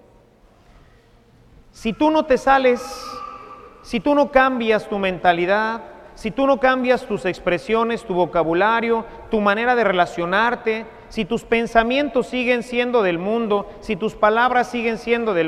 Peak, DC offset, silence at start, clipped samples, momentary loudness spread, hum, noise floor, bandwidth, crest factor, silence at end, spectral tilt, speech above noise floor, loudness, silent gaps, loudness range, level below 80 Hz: 0 dBFS; under 0.1%; 1.8 s; under 0.1%; 11 LU; none; -52 dBFS; 13.5 kHz; 20 dB; 0 s; -5.5 dB/octave; 33 dB; -19 LUFS; none; 2 LU; -46 dBFS